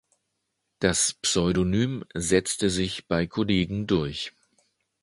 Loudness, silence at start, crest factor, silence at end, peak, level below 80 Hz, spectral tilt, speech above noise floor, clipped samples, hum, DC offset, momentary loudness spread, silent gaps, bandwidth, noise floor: -25 LUFS; 0.8 s; 22 dB; 0.75 s; -6 dBFS; -46 dBFS; -4 dB/octave; 54 dB; under 0.1%; none; under 0.1%; 6 LU; none; 11.5 kHz; -79 dBFS